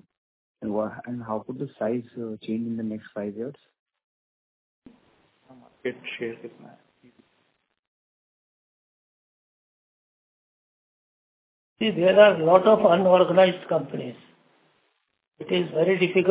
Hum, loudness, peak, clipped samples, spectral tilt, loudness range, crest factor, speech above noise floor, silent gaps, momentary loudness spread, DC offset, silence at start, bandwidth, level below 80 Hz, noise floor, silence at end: none; -22 LUFS; -2 dBFS; under 0.1%; -9.5 dB/octave; 19 LU; 24 dB; 50 dB; 3.79-3.86 s, 4.04-4.82 s, 7.79-11.76 s; 19 LU; under 0.1%; 0.6 s; 4 kHz; -70 dBFS; -72 dBFS; 0 s